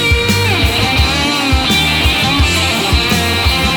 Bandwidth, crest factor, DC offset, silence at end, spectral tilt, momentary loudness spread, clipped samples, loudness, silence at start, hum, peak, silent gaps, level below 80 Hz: over 20 kHz; 12 dB; under 0.1%; 0 s; -3.5 dB/octave; 1 LU; under 0.1%; -11 LUFS; 0 s; none; 0 dBFS; none; -20 dBFS